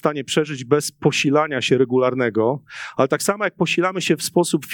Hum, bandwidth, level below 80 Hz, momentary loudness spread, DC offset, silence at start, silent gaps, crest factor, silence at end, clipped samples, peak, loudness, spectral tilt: none; 19 kHz; -66 dBFS; 4 LU; under 0.1%; 0.05 s; none; 18 dB; 0 s; under 0.1%; -2 dBFS; -20 LUFS; -4.5 dB/octave